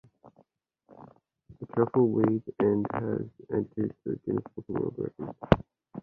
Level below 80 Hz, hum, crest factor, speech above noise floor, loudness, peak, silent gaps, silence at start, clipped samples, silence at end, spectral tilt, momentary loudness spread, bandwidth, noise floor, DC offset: -50 dBFS; none; 26 dB; 40 dB; -29 LUFS; -4 dBFS; none; 0.25 s; under 0.1%; 0 s; -10 dB/octave; 12 LU; 6.4 kHz; -68 dBFS; under 0.1%